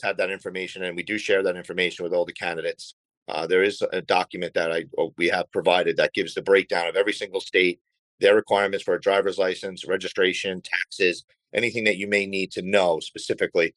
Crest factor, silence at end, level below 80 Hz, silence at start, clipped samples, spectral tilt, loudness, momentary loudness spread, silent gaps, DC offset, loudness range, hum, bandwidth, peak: 18 dB; 0.05 s; -70 dBFS; 0 s; under 0.1%; -4 dB/octave; -24 LUFS; 9 LU; 2.93-3.09 s, 3.17-3.26 s, 7.81-7.85 s, 7.99-8.18 s, 11.24-11.28 s; under 0.1%; 3 LU; none; 11.5 kHz; -6 dBFS